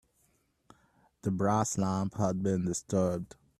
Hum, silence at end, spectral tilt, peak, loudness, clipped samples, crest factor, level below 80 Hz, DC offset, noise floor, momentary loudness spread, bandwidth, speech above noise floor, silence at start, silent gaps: none; 0.35 s; -6.5 dB/octave; -14 dBFS; -31 LUFS; under 0.1%; 20 dB; -62 dBFS; under 0.1%; -72 dBFS; 6 LU; 13.5 kHz; 42 dB; 1.25 s; none